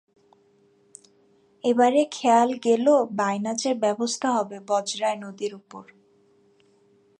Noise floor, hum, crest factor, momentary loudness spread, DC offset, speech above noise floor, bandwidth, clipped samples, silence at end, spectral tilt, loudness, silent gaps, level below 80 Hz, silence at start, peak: -61 dBFS; none; 18 dB; 13 LU; under 0.1%; 38 dB; 11 kHz; under 0.1%; 1.4 s; -4 dB/octave; -23 LUFS; none; -78 dBFS; 1.65 s; -6 dBFS